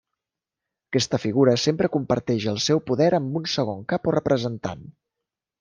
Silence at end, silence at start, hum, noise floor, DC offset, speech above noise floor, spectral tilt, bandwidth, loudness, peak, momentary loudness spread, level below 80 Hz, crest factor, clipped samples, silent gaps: 0.7 s; 0.9 s; none; -87 dBFS; under 0.1%; 65 dB; -5.5 dB/octave; 10 kHz; -23 LUFS; -6 dBFS; 8 LU; -58 dBFS; 18 dB; under 0.1%; none